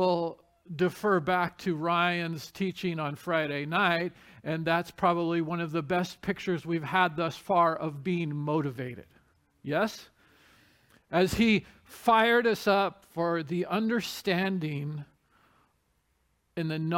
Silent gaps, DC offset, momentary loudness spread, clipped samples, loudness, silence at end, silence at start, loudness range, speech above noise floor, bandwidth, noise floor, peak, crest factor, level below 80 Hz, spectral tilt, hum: none; under 0.1%; 11 LU; under 0.1%; -29 LUFS; 0 s; 0 s; 6 LU; 44 dB; 17 kHz; -73 dBFS; -10 dBFS; 18 dB; -60 dBFS; -6 dB/octave; none